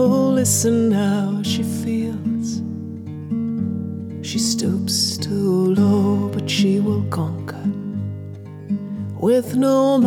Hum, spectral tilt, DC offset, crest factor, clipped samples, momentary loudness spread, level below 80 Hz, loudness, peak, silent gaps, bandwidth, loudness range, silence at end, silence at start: none; -5.5 dB/octave; under 0.1%; 16 dB; under 0.1%; 13 LU; -60 dBFS; -20 LUFS; -4 dBFS; none; 17 kHz; 5 LU; 0 s; 0 s